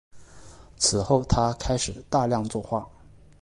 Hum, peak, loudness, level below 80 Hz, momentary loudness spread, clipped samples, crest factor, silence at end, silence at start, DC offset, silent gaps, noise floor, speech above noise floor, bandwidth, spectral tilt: none; -8 dBFS; -25 LUFS; -40 dBFS; 8 LU; under 0.1%; 20 dB; 0.55 s; 0.15 s; under 0.1%; none; -48 dBFS; 23 dB; 11.5 kHz; -4.5 dB/octave